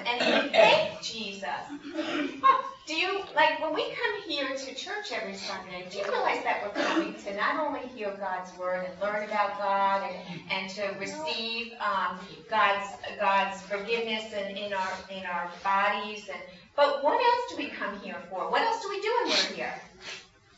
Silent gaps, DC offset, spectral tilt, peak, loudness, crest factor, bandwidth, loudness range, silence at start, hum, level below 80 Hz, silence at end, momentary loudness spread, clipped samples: none; under 0.1%; -3 dB/octave; -8 dBFS; -29 LUFS; 22 dB; 8 kHz; 3 LU; 0 s; none; -70 dBFS; 0.35 s; 12 LU; under 0.1%